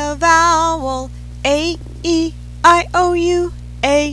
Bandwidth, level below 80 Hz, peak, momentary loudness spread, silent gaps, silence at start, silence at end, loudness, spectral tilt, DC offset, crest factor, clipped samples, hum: 11 kHz; -32 dBFS; 0 dBFS; 12 LU; none; 0 s; 0 s; -15 LUFS; -4 dB/octave; under 0.1%; 16 dB; under 0.1%; 60 Hz at -30 dBFS